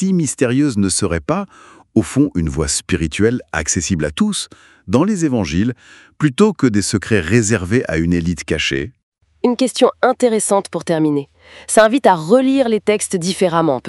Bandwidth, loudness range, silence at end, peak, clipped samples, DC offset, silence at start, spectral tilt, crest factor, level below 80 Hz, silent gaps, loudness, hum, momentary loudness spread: 12 kHz; 3 LU; 0 s; 0 dBFS; under 0.1%; under 0.1%; 0 s; -5 dB/octave; 16 dB; -38 dBFS; 9.03-9.12 s; -16 LUFS; none; 7 LU